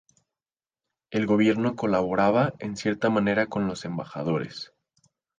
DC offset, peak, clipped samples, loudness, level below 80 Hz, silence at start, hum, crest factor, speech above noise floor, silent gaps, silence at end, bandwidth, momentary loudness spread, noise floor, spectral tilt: under 0.1%; -8 dBFS; under 0.1%; -25 LUFS; -60 dBFS; 1.1 s; none; 18 dB; over 65 dB; none; 0.75 s; 9.4 kHz; 11 LU; under -90 dBFS; -6.5 dB/octave